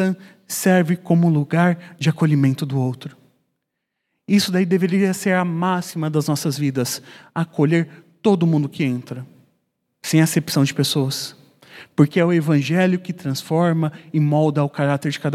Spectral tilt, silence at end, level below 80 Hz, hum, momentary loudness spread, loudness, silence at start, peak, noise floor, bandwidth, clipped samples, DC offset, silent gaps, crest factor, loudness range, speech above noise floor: -6 dB/octave; 0 s; -68 dBFS; none; 10 LU; -19 LUFS; 0 s; -2 dBFS; -78 dBFS; 15.5 kHz; under 0.1%; under 0.1%; none; 18 dB; 3 LU; 59 dB